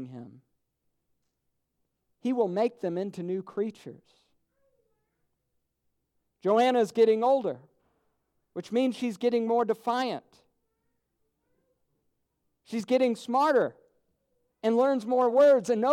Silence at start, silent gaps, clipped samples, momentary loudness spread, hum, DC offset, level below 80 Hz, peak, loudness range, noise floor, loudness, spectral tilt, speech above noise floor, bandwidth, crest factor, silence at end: 0 s; none; under 0.1%; 14 LU; none; under 0.1%; -82 dBFS; -12 dBFS; 9 LU; -79 dBFS; -27 LUFS; -6 dB/octave; 53 dB; 13 kHz; 18 dB; 0 s